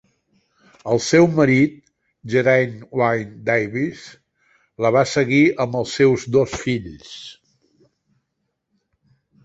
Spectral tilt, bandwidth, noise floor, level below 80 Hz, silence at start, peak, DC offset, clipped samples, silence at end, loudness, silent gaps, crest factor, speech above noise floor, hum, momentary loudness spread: -6 dB/octave; 8.2 kHz; -75 dBFS; -54 dBFS; 0.85 s; -2 dBFS; under 0.1%; under 0.1%; 2.15 s; -18 LUFS; none; 18 dB; 57 dB; none; 20 LU